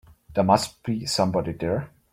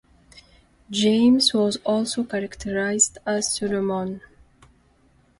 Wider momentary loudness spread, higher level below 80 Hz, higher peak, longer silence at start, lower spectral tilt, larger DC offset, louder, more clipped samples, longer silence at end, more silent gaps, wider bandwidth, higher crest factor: second, 9 LU vs 12 LU; about the same, -54 dBFS vs -54 dBFS; about the same, -4 dBFS vs -4 dBFS; about the same, 0.3 s vs 0.35 s; first, -5.5 dB/octave vs -3 dB/octave; neither; about the same, -24 LUFS vs -22 LUFS; neither; second, 0.25 s vs 1.2 s; neither; first, 16 kHz vs 11.5 kHz; about the same, 22 dB vs 20 dB